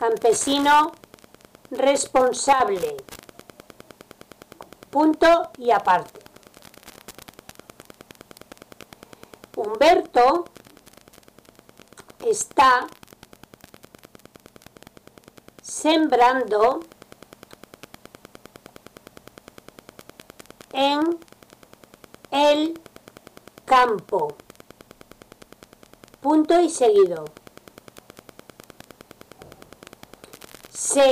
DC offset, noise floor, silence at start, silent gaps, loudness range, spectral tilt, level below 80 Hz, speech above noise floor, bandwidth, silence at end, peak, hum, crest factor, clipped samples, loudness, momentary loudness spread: under 0.1%; -52 dBFS; 0 s; none; 6 LU; -2.5 dB/octave; -58 dBFS; 33 dB; 16 kHz; 0 s; -8 dBFS; none; 16 dB; under 0.1%; -20 LUFS; 24 LU